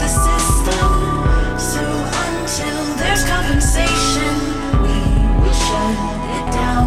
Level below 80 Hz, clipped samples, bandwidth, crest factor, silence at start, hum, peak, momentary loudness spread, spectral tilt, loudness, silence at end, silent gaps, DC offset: -18 dBFS; under 0.1%; 15 kHz; 12 dB; 0 s; none; -2 dBFS; 5 LU; -4 dB/octave; -17 LUFS; 0 s; none; under 0.1%